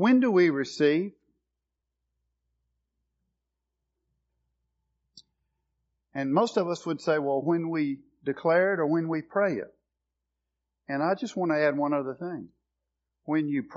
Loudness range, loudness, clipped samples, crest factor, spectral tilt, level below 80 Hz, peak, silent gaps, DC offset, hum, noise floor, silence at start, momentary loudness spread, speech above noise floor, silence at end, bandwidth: 6 LU; -27 LUFS; under 0.1%; 18 dB; -5.5 dB/octave; -78 dBFS; -12 dBFS; none; under 0.1%; none; -85 dBFS; 0 s; 12 LU; 59 dB; 0 s; 7.4 kHz